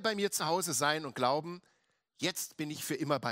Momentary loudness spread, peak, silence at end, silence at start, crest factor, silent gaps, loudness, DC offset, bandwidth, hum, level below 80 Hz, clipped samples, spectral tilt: 8 LU; -14 dBFS; 0 s; 0 s; 20 dB; none; -33 LUFS; under 0.1%; 16 kHz; none; -82 dBFS; under 0.1%; -3 dB/octave